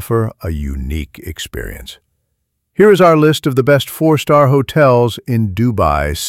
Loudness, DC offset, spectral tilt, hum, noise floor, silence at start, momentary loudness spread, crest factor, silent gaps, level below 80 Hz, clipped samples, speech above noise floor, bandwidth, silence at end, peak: -13 LUFS; under 0.1%; -6 dB/octave; none; -69 dBFS; 0 s; 17 LU; 12 dB; none; -30 dBFS; under 0.1%; 57 dB; 17 kHz; 0 s; 0 dBFS